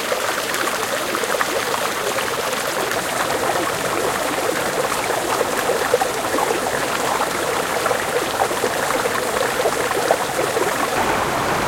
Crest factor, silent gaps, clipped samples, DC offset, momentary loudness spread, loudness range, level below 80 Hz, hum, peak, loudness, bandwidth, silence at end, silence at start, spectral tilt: 20 dB; none; under 0.1%; under 0.1%; 2 LU; 1 LU; -48 dBFS; none; 0 dBFS; -20 LUFS; 17 kHz; 0 s; 0 s; -2.5 dB/octave